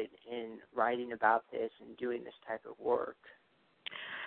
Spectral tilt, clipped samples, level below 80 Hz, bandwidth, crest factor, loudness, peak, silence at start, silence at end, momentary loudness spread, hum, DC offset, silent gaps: -1.5 dB/octave; under 0.1%; -80 dBFS; 4.4 kHz; 24 dB; -37 LUFS; -14 dBFS; 0 s; 0 s; 13 LU; none; under 0.1%; none